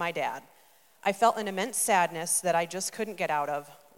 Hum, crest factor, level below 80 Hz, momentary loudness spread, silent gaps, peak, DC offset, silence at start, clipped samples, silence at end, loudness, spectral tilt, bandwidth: none; 18 dB; -82 dBFS; 9 LU; none; -10 dBFS; under 0.1%; 0 s; under 0.1%; 0.2 s; -28 LUFS; -2.5 dB/octave; 17 kHz